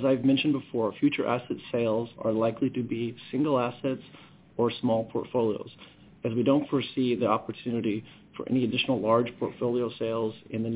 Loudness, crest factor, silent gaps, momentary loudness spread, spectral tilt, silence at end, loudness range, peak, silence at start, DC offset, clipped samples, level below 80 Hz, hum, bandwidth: -28 LUFS; 18 dB; none; 8 LU; -10.5 dB/octave; 0 s; 2 LU; -10 dBFS; 0 s; under 0.1%; under 0.1%; -64 dBFS; none; 4 kHz